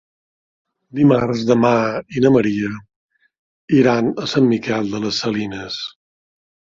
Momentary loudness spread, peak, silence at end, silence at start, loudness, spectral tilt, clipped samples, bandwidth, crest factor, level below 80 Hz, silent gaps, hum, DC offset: 12 LU; -2 dBFS; 0.8 s; 0.95 s; -17 LUFS; -6.5 dB/octave; under 0.1%; 7.6 kHz; 16 dB; -54 dBFS; 2.96-3.09 s, 3.39-3.68 s; none; under 0.1%